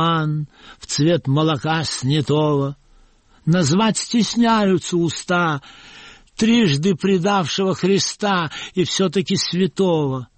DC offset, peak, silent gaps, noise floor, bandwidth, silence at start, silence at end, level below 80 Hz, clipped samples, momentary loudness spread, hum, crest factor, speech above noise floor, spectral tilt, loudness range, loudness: under 0.1%; -6 dBFS; none; -52 dBFS; 8.8 kHz; 0 s; 0.1 s; -52 dBFS; under 0.1%; 8 LU; none; 12 dB; 34 dB; -5 dB/octave; 1 LU; -19 LUFS